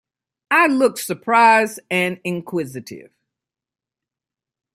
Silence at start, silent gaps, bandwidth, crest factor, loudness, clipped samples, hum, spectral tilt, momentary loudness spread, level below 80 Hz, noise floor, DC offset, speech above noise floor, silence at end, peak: 0.5 s; none; 16 kHz; 18 dB; -17 LUFS; under 0.1%; none; -4.5 dB/octave; 15 LU; -70 dBFS; -89 dBFS; under 0.1%; 71 dB; 1.75 s; -2 dBFS